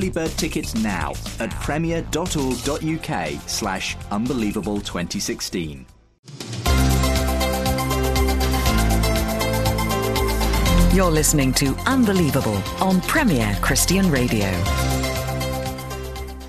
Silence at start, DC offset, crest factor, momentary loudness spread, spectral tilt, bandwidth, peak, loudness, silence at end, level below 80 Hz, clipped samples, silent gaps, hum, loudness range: 0 s; under 0.1%; 16 dB; 9 LU; -4.5 dB/octave; 14 kHz; -4 dBFS; -21 LUFS; 0 s; -26 dBFS; under 0.1%; 6.19-6.23 s; none; 6 LU